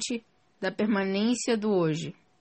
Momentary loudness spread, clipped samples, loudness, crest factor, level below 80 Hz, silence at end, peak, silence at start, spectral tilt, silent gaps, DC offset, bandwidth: 9 LU; under 0.1%; -28 LUFS; 14 dB; -72 dBFS; 0.3 s; -14 dBFS; 0 s; -5 dB/octave; none; under 0.1%; 8.8 kHz